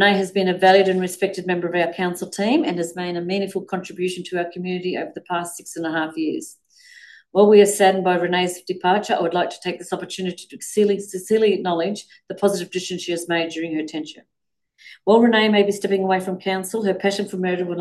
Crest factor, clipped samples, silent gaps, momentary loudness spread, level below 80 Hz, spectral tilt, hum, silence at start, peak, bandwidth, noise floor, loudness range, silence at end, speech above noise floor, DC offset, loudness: 18 dB; under 0.1%; none; 13 LU; -70 dBFS; -4.5 dB/octave; none; 0 s; -2 dBFS; 12.5 kHz; -66 dBFS; 7 LU; 0 s; 46 dB; under 0.1%; -20 LUFS